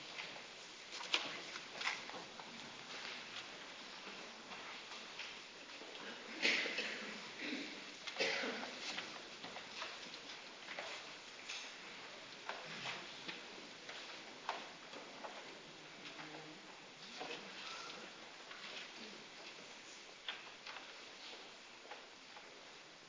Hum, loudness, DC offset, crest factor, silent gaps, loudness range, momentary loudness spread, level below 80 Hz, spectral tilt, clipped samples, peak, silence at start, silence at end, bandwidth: none; -46 LUFS; under 0.1%; 32 dB; none; 9 LU; 13 LU; -88 dBFS; -1.5 dB/octave; under 0.1%; -16 dBFS; 0 s; 0 s; 8 kHz